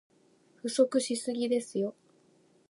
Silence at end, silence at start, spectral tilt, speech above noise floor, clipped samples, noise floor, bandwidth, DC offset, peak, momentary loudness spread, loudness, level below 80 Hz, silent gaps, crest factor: 0.8 s; 0.65 s; -4 dB/octave; 35 dB; under 0.1%; -65 dBFS; 11.5 kHz; under 0.1%; -12 dBFS; 9 LU; -31 LUFS; -86 dBFS; none; 20 dB